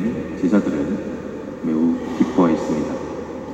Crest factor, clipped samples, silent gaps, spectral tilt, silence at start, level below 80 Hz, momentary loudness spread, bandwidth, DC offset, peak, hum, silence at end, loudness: 16 dB; under 0.1%; none; -7.5 dB/octave; 0 s; -48 dBFS; 12 LU; 8.4 kHz; under 0.1%; -4 dBFS; none; 0 s; -21 LUFS